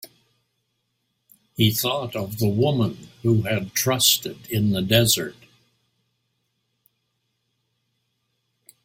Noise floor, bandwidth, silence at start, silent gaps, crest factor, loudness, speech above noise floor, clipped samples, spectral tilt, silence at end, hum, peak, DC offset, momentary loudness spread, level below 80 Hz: -74 dBFS; 16.5 kHz; 0.05 s; none; 22 dB; -21 LUFS; 53 dB; under 0.1%; -4 dB/octave; 3.55 s; none; -4 dBFS; under 0.1%; 10 LU; -56 dBFS